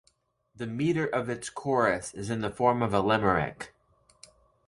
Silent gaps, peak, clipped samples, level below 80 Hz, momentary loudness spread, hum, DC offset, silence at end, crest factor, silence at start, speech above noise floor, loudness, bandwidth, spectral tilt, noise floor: none; -8 dBFS; under 0.1%; -56 dBFS; 12 LU; none; under 0.1%; 1 s; 22 dB; 0.6 s; 43 dB; -28 LUFS; 11.5 kHz; -5.5 dB/octave; -70 dBFS